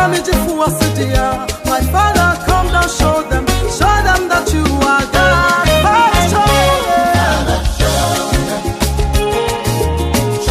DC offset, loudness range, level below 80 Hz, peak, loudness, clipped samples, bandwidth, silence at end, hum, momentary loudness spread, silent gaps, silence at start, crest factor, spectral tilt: under 0.1%; 3 LU; -20 dBFS; 0 dBFS; -13 LUFS; under 0.1%; 15.5 kHz; 0 s; none; 6 LU; none; 0 s; 12 dB; -4.5 dB/octave